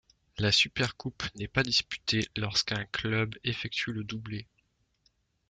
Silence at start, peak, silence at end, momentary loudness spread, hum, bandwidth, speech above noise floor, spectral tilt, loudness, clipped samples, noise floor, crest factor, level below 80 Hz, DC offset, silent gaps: 0.35 s; -8 dBFS; 1.05 s; 13 LU; none; 9.4 kHz; 42 dB; -3.5 dB/octave; -29 LUFS; under 0.1%; -73 dBFS; 24 dB; -56 dBFS; under 0.1%; none